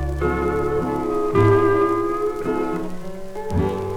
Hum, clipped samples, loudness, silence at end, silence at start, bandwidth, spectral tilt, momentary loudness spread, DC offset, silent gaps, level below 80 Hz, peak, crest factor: none; under 0.1%; -21 LUFS; 0 s; 0 s; 16 kHz; -8 dB/octave; 14 LU; under 0.1%; none; -34 dBFS; -6 dBFS; 16 dB